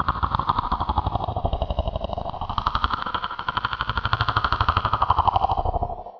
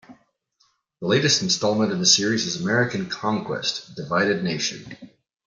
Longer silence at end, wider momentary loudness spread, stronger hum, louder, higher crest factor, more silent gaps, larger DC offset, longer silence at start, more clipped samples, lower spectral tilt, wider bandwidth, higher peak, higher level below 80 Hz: second, 0 s vs 0.4 s; second, 7 LU vs 10 LU; neither; second, -24 LUFS vs -21 LUFS; about the same, 22 dB vs 20 dB; neither; neither; about the same, 0 s vs 0.1 s; neither; first, -7 dB/octave vs -3 dB/octave; second, 5.4 kHz vs 11 kHz; about the same, -2 dBFS vs -4 dBFS; first, -32 dBFS vs -64 dBFS